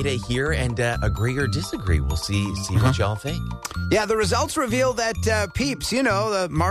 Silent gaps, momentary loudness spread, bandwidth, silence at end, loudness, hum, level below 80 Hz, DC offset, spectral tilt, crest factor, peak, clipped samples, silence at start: none; 4 LU; 14 kHz; 0 s; -23 LUFS; none; -34 dBFS; under 0.1%; -5 dB/octave; 14 dB; -8 dBFS; under 0.1%; 0 s